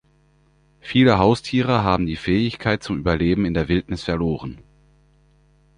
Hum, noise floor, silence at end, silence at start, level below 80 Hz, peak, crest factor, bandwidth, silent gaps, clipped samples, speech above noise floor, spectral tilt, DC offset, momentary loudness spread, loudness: 50 Hz at -45 dBFS; -58 dBFS; 1.25 s; 0.85 s; -38 dBFS; -2 dBFS; 20 dB; 10.5 kHz; none; under 0.1%; 39 dB; -7 dB/octave; under 0.1%; 9 LU; -20 LUFS